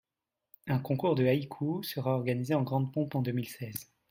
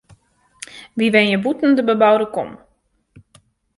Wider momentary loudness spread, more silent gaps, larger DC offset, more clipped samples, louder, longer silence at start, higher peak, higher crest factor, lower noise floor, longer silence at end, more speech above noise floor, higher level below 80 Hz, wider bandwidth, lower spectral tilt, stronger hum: second, 12 LU vs 21 LU; neither; neither; neither; second, -32 LUFS vs -16 LUFS; about the same, 0.65 s vs 0.75 s; second, -16 dBFS vs 0 dBFS; about the same, 16 dB vs 18 dB; first, -89 dBFS vs -63 dBFS; second, 0.3 s vs 1.25 s; first, 58 dB vs 47 dB; second, -68 dBFS vs -60 dBFS; first, 16.5 kHz vs 11.5 kHz; first, -7 dB/octave vs -5.5 dB/octave; neither